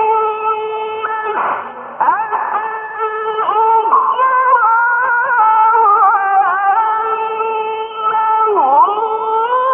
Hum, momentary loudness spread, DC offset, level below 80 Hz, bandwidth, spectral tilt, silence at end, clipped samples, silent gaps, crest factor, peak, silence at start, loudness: none; 9 LU; under 0.1%; -66 dBFS; 3.7 kHz; -6.5 dB/octave; 0 s; under 0.1%; none; 12 dB; -2 dBFS; 0 s; -13 LUFS